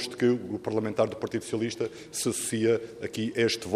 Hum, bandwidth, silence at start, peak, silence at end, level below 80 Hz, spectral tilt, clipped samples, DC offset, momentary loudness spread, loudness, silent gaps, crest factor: none; 15 kHz; 0 s; -8 dBFS; 0 s; -66 dBFS; -4.5 dB/octave; under 0.1%; under 0.1%; 7 LU; -29 LUFS; none; 20 dB